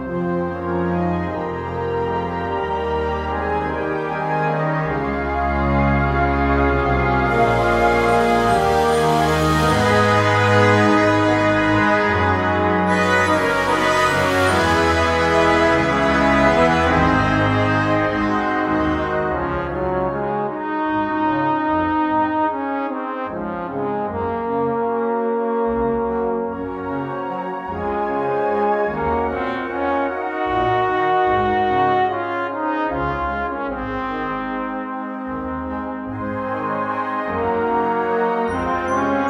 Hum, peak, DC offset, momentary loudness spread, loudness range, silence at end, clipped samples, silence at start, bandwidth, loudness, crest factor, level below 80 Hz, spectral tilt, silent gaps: none; -2 dBFS; under 0.1%; 9 LU; 7 LU; 0 s; under 0.1%; 0 s; 16 kHz; -19 LUFS; 16 dB; -34 dBFS; -6 dB/octave; none